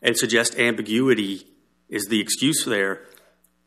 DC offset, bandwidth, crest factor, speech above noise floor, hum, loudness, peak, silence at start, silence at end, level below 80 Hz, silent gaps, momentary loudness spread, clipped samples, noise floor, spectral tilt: under 0.1%; 14.5 kHz; 20 dB; 37 dB; none; -21 LUFS; -4 dBFS; 0 s; 0.65 s; -70 dBFS; none; 11 LU; under 0.1%; -59 dBFS; -3 dB/octave